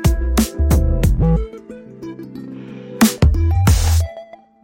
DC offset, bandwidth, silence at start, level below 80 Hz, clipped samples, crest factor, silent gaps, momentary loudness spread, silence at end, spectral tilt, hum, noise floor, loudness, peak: under 0.1%; 16.5 kHz; 0 s; -20 dBFS; under 0.1%; 14 dB; none; 19 LU; 0.4 s; -6 dB/octave; none; -38 dBFS; -16 LUFS; -2 dBFS